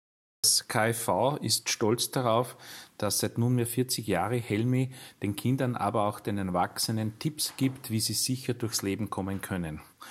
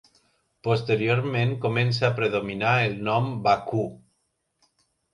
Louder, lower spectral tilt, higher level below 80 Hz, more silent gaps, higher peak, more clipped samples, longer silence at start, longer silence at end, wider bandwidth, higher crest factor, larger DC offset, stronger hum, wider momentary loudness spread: second, -29 LUFS vs -24 LUFS; second, -4 dB/octave vs -7 dB/octave; second, -66 dBFS vs -60 dBFS; neither; second, -10 dBFS vs -6 dBFS; neither; second, 0.45 s vs 0.65 s; second, 0 s vs 1.15 s; first, 16.5 kHz vs 10.5 kHz; about the same, 20 dB vs 18 dB; neither; neither; first, 8 LU vs 5 LU